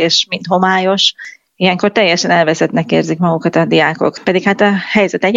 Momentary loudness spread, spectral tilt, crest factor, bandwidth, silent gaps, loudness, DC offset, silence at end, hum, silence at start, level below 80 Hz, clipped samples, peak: 4 LU; -4.5 dB/octave; 12 dB; 7.8 kHz; none; -12 LUFS; under 0.1%; 0 s; none; 0 s; -56 dBFS; under 0.1%; 0 dBFS